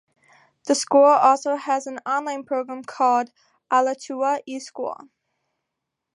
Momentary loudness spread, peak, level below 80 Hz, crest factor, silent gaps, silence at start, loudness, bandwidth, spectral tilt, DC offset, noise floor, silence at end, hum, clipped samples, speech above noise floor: 17 LU; -4 dBFS; -82 dBFS; 18 dB; none; 0.65 s; -21 LUFS; 11.5 kHz; -2.5 dB/octave; under 0.1%; -82 dBFS; 1.25 s; none; under 0.1%; 61 dB